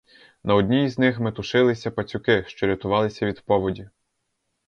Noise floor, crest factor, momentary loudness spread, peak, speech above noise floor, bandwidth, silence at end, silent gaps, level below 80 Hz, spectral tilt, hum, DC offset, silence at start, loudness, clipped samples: -76 dBFS; 20 dB; 9 LU; -4 dBFS; 54 dB; 7.4 kHz; 0.8 s; none; -50 dBFS; -7 dB/octave; none; under 0.1%; 0.45 s; -22 LUFS; under 0.1%